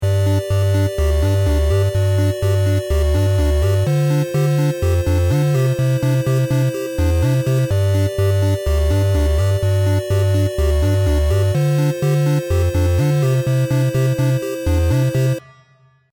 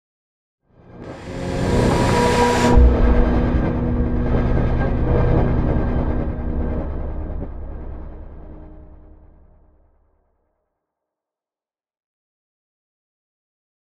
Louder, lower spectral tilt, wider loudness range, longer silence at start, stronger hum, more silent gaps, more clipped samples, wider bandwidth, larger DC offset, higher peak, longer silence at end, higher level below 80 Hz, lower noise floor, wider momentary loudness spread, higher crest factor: about the same, -17 LUFS vs -19 LUFS; about the same, -7 dB/octave vs -7 dB/octave; second, 1 LU vs 17 LU; second, 0 s vs 0.95 s; neither; neither; neither; first, 19 kHz vs 12 kHz; neither; second, -8 dBFS vs -2 dBFS; second, 0.75 s vs 5.1 s; about the same, -24 dBFS vs -24 dBFS; second, -53 dBFS vs under -90 dBFS; second, 2 LU vs 21 LU; second, 8 dB vs 18 dB